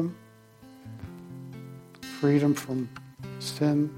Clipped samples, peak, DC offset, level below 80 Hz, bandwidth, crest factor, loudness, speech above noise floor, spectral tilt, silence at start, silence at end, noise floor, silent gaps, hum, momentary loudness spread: under 0.1%; -12 dBFS; under 0.1%; -64 dBFS; 16.5 kHz; 18 dB; -28 LUFS; 27 dB; -6.5 dB/octave; 0 s; 0 s; -53 dBFS; none; none; 21 LU